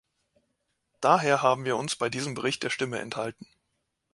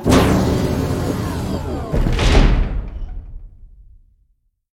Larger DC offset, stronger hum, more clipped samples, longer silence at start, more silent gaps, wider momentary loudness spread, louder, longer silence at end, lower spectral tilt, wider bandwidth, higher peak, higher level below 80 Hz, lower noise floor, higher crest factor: neither; neither; neither; first, 1 s vs 0 s; neither; second, 11 LU vs 19 LU; second, -27 LUFS vs -18 LUFS; second, 0.7 s vs 1.05 s; second, -4 dB/octave vs -6 dB/octave; second, 11.5 kHz vs 16.5 kHz; second, -6 dBFS vs 0 dBFS; second, -70 dBFS vs -22 dBFS; first, -79 dBFS vs -61 dBFS; first, 24 dB vs 16 dB